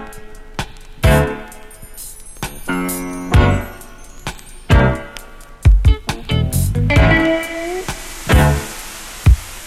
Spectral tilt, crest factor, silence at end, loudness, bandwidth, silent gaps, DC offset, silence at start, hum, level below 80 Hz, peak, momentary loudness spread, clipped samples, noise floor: -5.5 dB/octave; 16 dB; 0 s; -16 LUFS; 16 kHz; none; under 0.1%; 0 s; none; -20 dBFS; 0 dBFS; 19 LU; under 0.1%; -35 dBFS